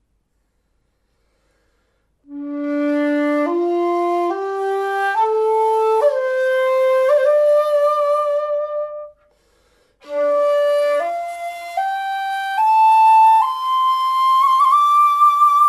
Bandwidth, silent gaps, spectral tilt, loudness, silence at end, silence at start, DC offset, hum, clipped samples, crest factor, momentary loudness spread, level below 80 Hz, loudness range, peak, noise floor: 15 kHz; none; -2.5 dB/octave; -16 LUFS; 0 s; 2.3 s; under 0.1%; none; under 0.1%; 12 dB; 12 LU; -66 dBFS; 7 LU; -6 dBFS; -66 dBFS